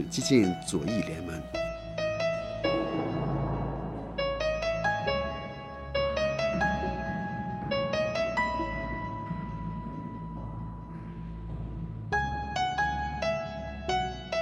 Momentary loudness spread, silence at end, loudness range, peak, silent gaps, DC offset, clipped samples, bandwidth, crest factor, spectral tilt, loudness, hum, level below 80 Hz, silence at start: 11 LU; 0 s; 6 LU; -10 dBFS; none; under 0.1%; under 0.1%; 14.5 kHz; 20 dB; -5.5 dB/octave; -31 LUFS; none; -44 dBFS; 0 s